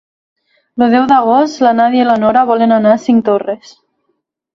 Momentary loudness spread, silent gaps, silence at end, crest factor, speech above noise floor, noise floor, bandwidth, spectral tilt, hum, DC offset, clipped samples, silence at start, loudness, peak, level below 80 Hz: 7 LU; none; 1.05 s; 12 dB; 56 dB; -66 dBFS; 7.4 kHz; -6 dB/octave; none; under 0.1%; under 0.1%; 0.75 s; -11 LUFS; 0 dBFS; -56 dBFS